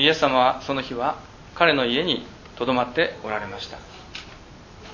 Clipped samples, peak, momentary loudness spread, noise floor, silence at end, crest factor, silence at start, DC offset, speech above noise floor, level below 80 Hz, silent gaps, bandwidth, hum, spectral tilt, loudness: under 0.1%; 0 dBFS; 21 LU; -44 dBFS; 0 s; 24 dB; 0 s; under 0.1%; 21 dB; -50 dBFS; none; 7.4 kHz; none; -4.5 dB/octave; -22 LUFS